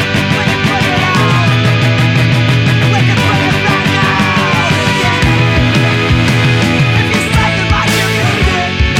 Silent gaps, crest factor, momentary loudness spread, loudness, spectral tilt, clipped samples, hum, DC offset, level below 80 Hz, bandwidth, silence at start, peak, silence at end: none; 10 dB; 1 LU; -10 LUFS; -5 dB/octave; under 0.1%; none; under 0.1%; -24 dBFS; 16 kHz; 0 s; 0 dBFS; 0 s